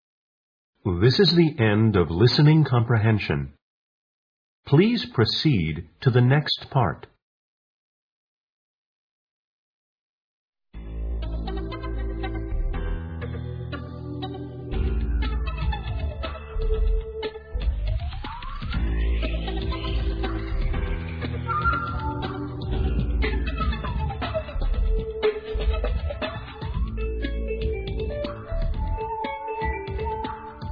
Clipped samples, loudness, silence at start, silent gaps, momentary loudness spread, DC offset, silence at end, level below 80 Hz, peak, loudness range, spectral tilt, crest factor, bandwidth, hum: under 0.1%; -26 LUFS; 0.85 s; 3.62-4.63 s, 7.22-10.53 s; 14 LU; under 0.1%; 0 s; -30 dBFS; -6 dBFS; 11 LU; -8 dB/octave; 20 dB; 5.4 kHz; none